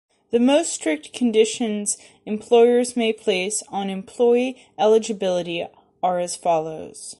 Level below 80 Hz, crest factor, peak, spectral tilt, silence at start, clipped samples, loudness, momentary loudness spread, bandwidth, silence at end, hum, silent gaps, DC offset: -66 dBFS; 16 dB; -4 dBFS; -3.5 dB/octave; 0.3 s; under 0.1%; -21 LUFS; 12 LU; 11.5 kHz; 0.05 s; none; none; under 0.1%